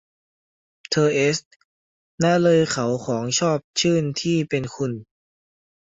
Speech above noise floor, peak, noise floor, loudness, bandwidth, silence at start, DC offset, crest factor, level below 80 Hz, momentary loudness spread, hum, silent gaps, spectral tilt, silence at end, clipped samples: over 69 dB; -6 dBFS; under -90 dBFS; -21 LUFS; 8 kHz; 0.9 s; under 0.1%; 18 dB; -60 dBFS; 10 LU; none; 1.45-2.18 s, 3.64-3.74 s; -4.5 dB/octave; 0.9 s; under 0.1%